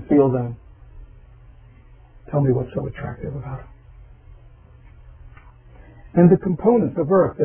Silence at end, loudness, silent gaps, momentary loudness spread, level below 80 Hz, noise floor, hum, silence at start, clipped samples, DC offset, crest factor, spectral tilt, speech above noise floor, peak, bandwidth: 0 s; -20 LUFS; none; 17 LU; -44 dBFS; -47 dBFS; none; 0 s; under 0.1%; under 0.1%; 20 dB; -13.5 dB/octave; 28 dB; -2 dBFS; 3.3 kHz